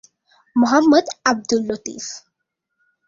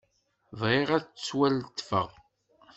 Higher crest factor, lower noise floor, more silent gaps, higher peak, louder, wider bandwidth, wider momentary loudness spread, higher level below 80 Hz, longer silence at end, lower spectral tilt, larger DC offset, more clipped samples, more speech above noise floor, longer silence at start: about the same, 18 dB vs 22 dB; first, -78 dBFS vs -62 dBFS; neither; first, -2 dBFS vs -10 dBFS; first, -18 LUFS vs -29 LUFS; about the same, 7.6 kHz vs 8.2 kHz; first, 17 LU vs 9 LU; about the same, -62 dBFS vs -64 dBFS; first, 0.9 s vs 0.65 s; second, -3.5 dB/octave vs -5.5 dB/octave; neither; neither; first, 60 dB vs 34 dB; about the same, 0.55 s vs 0.5 s